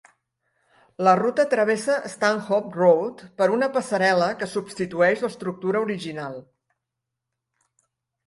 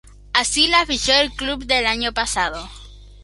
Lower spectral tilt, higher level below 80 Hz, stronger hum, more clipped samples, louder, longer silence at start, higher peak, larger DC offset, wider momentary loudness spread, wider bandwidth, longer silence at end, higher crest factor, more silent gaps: first, -5 dB/octave vs -1 dB/octave; second, -68 dBFS vs -38 dBFS; second, none vs 50 Hz at -35 dBFS; neither; second, -22 LUFS vs -18 LUFS; first, 1 s vs 0.05 s; second, -4 dBFS vs 0 dBFS; neither; about the same, 11 LU vs 10 LU; about the same, 11.5 kHz vs 11.5 kHz; first, 1.85 s vs 0 s; about the same, 20 dB vs 20 dB; neither